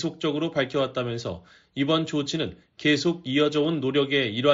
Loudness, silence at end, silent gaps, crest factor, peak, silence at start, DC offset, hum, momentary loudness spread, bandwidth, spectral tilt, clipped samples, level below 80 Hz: -25 LUFS; 0 s; none; 18 dB; -8 dBFS; 0 s; under 0.1%; none; 10 LU; 7.8 kHz; -4 dB/octave; under 0.1%; -60 dBFS